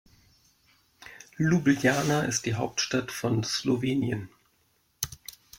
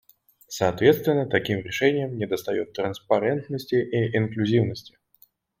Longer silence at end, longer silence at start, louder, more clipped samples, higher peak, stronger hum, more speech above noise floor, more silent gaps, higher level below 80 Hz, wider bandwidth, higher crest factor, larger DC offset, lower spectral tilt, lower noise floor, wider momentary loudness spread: second, 0.25 s vs 0.8 s; first, 1 s vs 0.5 s; second, -27 LUFS vs -24 LUFS; neither; second, -8 dBFS vs -4 dBFS; neither; first, 43 dB vs 37 dB; neither; about the same, -60 dBFS vs -62 dBFS; about the same, 16.5 kHz vs 16.5 kHz; about the same, 22 dB vs 20 dB; neither; second, -4.5 dB/octave vs -6 dB/octave; first, -69 dBFS vs -60 dBFS; first, 21 LU vs 9 LU